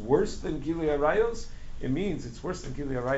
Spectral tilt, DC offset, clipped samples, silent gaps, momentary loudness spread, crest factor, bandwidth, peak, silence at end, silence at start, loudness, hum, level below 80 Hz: -6 dB/octave; under 0.1%; under 0.1%; none; 11 LU; 18 dB; 8 kHz; -12 dBFS; 0 s; 0 s; -30 LUFS; none; -40 dBFS